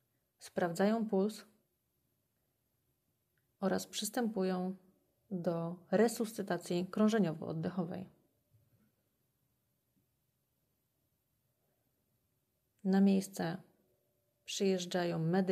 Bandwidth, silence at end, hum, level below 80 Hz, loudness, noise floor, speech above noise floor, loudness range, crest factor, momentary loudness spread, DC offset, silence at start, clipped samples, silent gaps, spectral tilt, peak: 15.5 kHz; 0 s; none; -82 dBFS; -35 LUFS; -81 dBFS; 47 dB; 6 LU; 18 dB; 12 LU; under 0.1%; 0.4 s; under 0.1%; none; -6 dB/octave; -18 dBFS